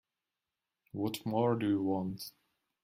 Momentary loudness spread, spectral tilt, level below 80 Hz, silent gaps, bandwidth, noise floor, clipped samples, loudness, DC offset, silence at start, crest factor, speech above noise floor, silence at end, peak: 15 LU; -7 dB/octave; -72 dBFS; none; 16 kHz; -90 dBFS; under 0.1%; -34 LUFS; under 0.1%; 0.95 s; 18 dB; 57 dB; 0.55 s; -18 dBFS